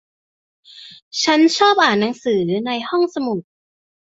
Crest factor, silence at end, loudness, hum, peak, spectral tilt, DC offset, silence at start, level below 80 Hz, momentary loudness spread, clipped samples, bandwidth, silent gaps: 18 dB; 0.75 s; -17 LUFS; none; -2 dBFS; -4 dB/octave; under 0.1%; 0.75 s; -66 dBFS; 11 LU; under 0.1%; 8 kHz; 1.02-1.11 s